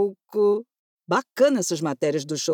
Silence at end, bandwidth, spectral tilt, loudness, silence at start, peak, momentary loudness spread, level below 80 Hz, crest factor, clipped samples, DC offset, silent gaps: 0 s; 17.5 kHz; -4.5 dB/octave; -23 LUFS; 0 s; -8 dBFS; 6 LU; -80 dBFS; 16 dB; under 0.1%; under 0.1%; 0.79-0.99 s